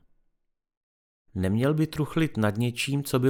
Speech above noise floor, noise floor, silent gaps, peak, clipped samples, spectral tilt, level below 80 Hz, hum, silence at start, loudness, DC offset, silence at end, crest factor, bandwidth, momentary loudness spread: 49 dB; -74 dBFS; none; -10 dBFS; under 0.1%; -6 dB/octave; -56 dBFS; none; 1.35 s; -27 LUFS; under 0.1%; 0 s; 18 dB; over 20 kHz; 4 LU